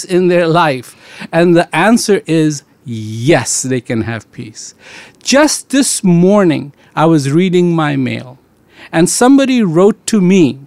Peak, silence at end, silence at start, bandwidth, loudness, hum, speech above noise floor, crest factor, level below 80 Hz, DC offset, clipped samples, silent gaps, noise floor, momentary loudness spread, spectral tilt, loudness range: 0 dBFS; 0 s; 0 s; 15 kHz; -11 LUFS; none; 29 dB; 12 dB; -52 dBFS; 0.2%; under 0.1%; none; -41 dBFS; 15 LU; -5 dB/octave; 4 LU